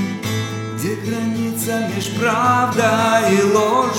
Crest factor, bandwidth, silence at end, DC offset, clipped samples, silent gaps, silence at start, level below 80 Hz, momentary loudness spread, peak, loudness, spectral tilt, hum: 16 dB; 18 kHz; 0 s; under 0.1%; under 0.1%; none; 0 s; -58 dBFS; 9 LU; -2 dBFS; -18 LUFS; -5 dB/octave; none